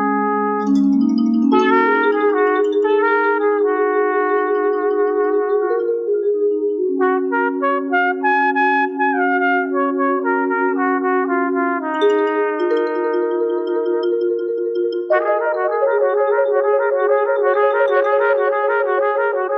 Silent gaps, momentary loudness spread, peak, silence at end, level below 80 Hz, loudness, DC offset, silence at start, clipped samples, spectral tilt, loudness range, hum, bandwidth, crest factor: none; 4 LU; -2 dBFS; 0 s; -72 dBFS; -17 LUFS; under 0.1%; 0 s; under 0.1%; -7 dB/octave; 3 LU; none; 6.8 kHz; 14 dB